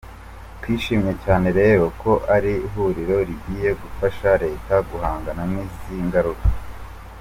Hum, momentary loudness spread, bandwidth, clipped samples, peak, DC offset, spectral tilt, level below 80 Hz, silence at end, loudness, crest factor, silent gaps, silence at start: none; 17 LU; 16 kHz; under 0.1%; -4 dBFS; under 0.1%; -7.5 dB/octave; -32 dBFS; 0 s; -21 LUFS; 16 dB; none; 0.05 s